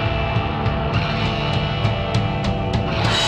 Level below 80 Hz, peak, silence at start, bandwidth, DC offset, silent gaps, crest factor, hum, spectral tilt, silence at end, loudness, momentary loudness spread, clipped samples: -30 dBFS; -6 dBFS; 0 s; 9.8 kHz; under 0.1%; none; 14 dB; none; -5.5 dB/octave; 0 s; -21 LUFS; 2 LU; under 0.1%